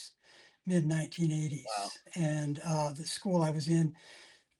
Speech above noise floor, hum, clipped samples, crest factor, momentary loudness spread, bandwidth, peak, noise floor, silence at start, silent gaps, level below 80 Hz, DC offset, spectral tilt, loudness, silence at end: 30 dB; none; under 0.1%; 16 dB; 10 LU; 12 kHz; -18 dBFS; -62 dBFS; 0 s; none; -74 dBFS; under 0.1%; -6 dB/octave; -33 LUFS; 0.35 s